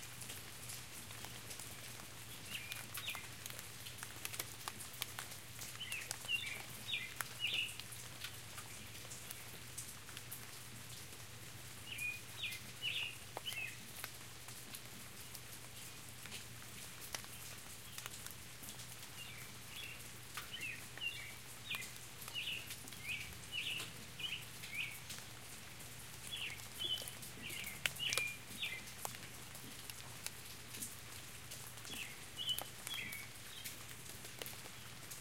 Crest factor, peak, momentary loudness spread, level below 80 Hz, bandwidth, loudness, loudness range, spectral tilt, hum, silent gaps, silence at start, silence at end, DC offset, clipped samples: 36 dB; -12 dBFS; 10 LU; -70 dBFS; 17 kHz; -45 LUFS; 7 LU; -1 dB/octave; none; none; 0 s; 0 s; 0.1%; under 0.1%